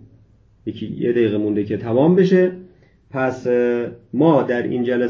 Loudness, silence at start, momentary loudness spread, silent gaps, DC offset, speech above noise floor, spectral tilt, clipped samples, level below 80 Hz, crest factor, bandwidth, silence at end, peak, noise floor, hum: -18 LUFS; 0.65 s; 15 LU; none; under 0.1%; 35 dB; -8.5 dB/octave; under 0.1%; -54 dBFS; 16 dB; 7 kHz; 0 s; -2 dBFS; -52 dBFS; none